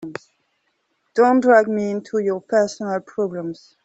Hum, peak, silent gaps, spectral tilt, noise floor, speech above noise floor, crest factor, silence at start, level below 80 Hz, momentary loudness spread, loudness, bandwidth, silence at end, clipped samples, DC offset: none; -2 dBFS; none; -6 dB/octave; -69 dBFS; 51 dB; 18 dB; 0 s; -68 dBFS; 16 LU; -19 LUFS; 8.2 kHz; 0.3 s; under 0.1%; under 0.1%